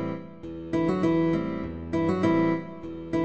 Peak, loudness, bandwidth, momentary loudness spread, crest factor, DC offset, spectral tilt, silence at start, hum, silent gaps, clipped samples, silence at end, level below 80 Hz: -12 dBFS; -26 LUFS; 8.2 kHz; 15 LU; 14 dB; 0.3%; -8.5 dB/octave; 0 s; none; none; under 0.1%; 0 s; -50 dBFS